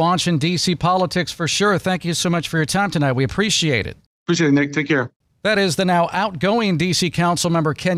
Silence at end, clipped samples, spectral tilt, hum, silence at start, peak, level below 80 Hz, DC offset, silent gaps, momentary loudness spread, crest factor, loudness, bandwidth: 0 s; under 0.1%; -4.5 dB/octave; none; 0 s; -8 dBFS; -48 dBFS; under 0.1%; 4.06-4.26 s, 5.16-5.20 s; 4 LU; 12 dB; -18 LUFS; 15 kHz